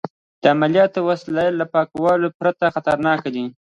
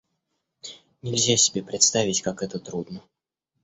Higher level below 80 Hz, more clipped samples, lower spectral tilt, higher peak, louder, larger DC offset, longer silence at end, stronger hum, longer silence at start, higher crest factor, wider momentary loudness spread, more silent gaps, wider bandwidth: about the same, -58 dBFS vs -62 dBFS; neither; first, -7 dB/octave vs -2.5 dB/octave; first, 0 dBFS vs -4 dBFS; first, -19 LUFS vs -22 LUFS; neither; second, 0.2 s vs 0.65 s; neither; second, 0.05 s vs 0.65 s; about the same, 18 dB vs 22 dB; second, 6 LU vs 22 LU; first, 0.10-0.42 s, 2.34-2.40 s vs none; about the same, 8.8 kHz vs 8.6 kHz